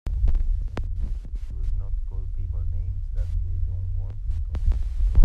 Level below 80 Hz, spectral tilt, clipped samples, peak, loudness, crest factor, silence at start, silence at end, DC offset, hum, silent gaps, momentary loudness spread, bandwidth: -26 dBFS; -8.5 dB/octave; under 0.1%; -4 dBFS; -30 LUFS; 18 dB; 0.05 s; 0 s; under 0.1%; none; none; 6 LU; 3.8 kHz